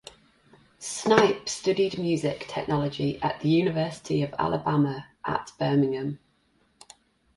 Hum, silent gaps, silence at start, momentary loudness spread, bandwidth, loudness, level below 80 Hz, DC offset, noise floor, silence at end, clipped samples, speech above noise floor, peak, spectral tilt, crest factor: none; none; 0.8 s; 10 LU; 11.5 kHz; -26 LUFS; -58 dBFS; under 0.1%; -67 dBFS; 1.2 s; under 0.1%; 41 dB; -2 dBFS; -5.5 dB/octave; 24 dB